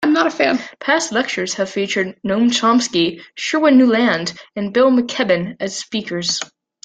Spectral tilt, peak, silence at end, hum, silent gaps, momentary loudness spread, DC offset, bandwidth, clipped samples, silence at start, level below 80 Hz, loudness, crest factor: -3.5 dB/octave; -2 dBFS; 0.4 s; none; none; 10 LU; under 0.1%; 9.2 kHz; under 0.1%; 0 s; -60 dBFS; -17 LUFS; 16 dB